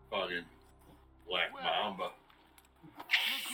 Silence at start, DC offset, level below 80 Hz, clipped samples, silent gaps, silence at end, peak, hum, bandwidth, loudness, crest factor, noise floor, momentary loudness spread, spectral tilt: 0.1 s; under 0.1%; -68 dBFS; under 0.1%; none; 0 s; -16 dBFS; none; 17.5 kHz; -34 LUFS; 24 dB; -63 dBFS; 13 LU; -2 dB/octave